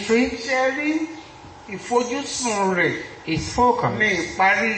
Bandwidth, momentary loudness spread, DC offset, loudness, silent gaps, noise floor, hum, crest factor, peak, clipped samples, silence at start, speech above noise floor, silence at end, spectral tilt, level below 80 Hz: 8.8 kHz; 15 LU; under 0.1%; -21 LUFS; none; -41 dBFS; none; 16 dB; -6 dBFS; under 0.1%; 0 s; 20 dB; 0 s; -4 dB/octave; -48 dBFS